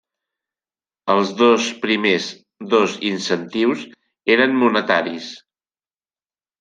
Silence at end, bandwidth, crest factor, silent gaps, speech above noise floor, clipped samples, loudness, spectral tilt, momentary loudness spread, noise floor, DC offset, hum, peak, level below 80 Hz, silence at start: 1.25 s; 9.6 kHz; 20 dB; none; over 72 dB; under 0.1%; -18 LUFS; -4 dB/octave; 14 LU; under -90 dBFS; under 0.1%; none; -2 dBFS; -66 dBFS; 1.05 s